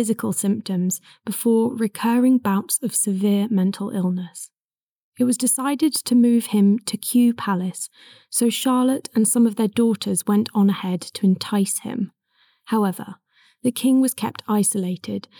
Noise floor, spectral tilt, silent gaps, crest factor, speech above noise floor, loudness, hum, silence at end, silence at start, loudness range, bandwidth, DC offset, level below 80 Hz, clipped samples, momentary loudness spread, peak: under -90 dBFS; -5 dB/octave; 4.60-4.70 s, 4.83-5.12 s; 12 dB; over 70 dB; -21 LUFS; none; 0.2 s; 0 s; 3 LU; 19.5 kHz; under 0.1%; -86 dBFS; under 0.1%; 11 LU; -10 dBFS